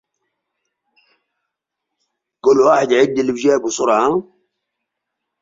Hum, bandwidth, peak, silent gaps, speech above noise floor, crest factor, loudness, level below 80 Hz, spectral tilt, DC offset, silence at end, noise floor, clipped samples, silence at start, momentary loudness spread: none; 7.8 kHz; -2 dBFS; none; 65 dB; 18 dB; -15 LUFS; -62 dBFS; -4.5 dB/octave; under 0.1%; 1.2 s; -80 dBFS; under 0.1%; 2.45 s; 6 LU